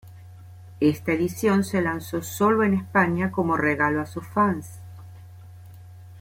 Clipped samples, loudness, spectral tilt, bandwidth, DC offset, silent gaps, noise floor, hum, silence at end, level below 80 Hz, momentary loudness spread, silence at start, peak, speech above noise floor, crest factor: under 0.1%; -23 LUFS; -6.5 dB/octave; 16.5 kHz; under 0.1%; none; -44 dBFS; none; 0 s; -58 dBFS; 11 LU; 0.05 s; -6 dBFS; 21 dB; 18 dB